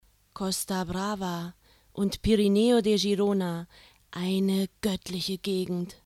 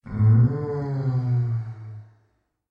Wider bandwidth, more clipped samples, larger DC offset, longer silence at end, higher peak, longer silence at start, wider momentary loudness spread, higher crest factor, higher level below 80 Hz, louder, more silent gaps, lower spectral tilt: first, 15.5 kHz vs 2.4 kHz; neither; neither; second, 0.1 s vs 0.65 s; about the same, -10 dBFS vs -10 dBFS; first, 0.35 s vs 0.05 s; second, 14 LU vs 21 LU; about the same, 16 dB vs 14 dB; about the same, -50 dBFS vs -50 dBFS; second, -27 LUFS vs -23 LUFS; neither; second, -5.5 dB/octave vs -11.5 dB/octave